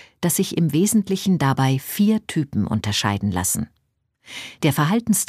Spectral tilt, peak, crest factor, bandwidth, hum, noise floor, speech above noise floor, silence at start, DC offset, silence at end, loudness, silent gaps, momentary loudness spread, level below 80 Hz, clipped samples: -5 dB/octave; -4 dBFS; 16 dB; 15.5 kHz; none; -68 dBFS; 48 dB; 0.2 s; under 0.1%; 0.05 s; -21 LUFS; none; 6 LU; -52 dBFS; under 0.1%